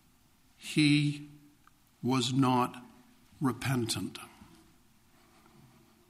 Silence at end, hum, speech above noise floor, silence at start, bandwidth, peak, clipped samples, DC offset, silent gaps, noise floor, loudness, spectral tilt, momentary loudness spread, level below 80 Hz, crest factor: 1.8 s; none; 35 dB; 0.6 s; 15.5 kHz; -14 dBFS; under 0.1%; under 0.1%; none; -65 dBFS; -30 LUFS; -5 dB/octave; 21 LU; -66 dBFS; 20 dB